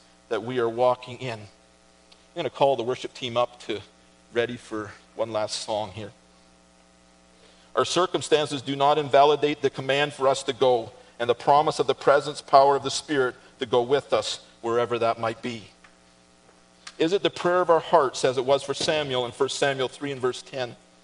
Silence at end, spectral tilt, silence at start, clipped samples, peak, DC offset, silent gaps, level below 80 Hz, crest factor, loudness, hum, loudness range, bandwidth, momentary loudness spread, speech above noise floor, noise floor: 0.3 s; -4 dB/octave; 0.3 s; under 0.1%; -2 dBFS; under 0.1%; none; -66 dBFS; 24 dB; -24 LUFS; none; 8 LU; 10.5 kHz; 14 LU; 33 dB; -57 dBFS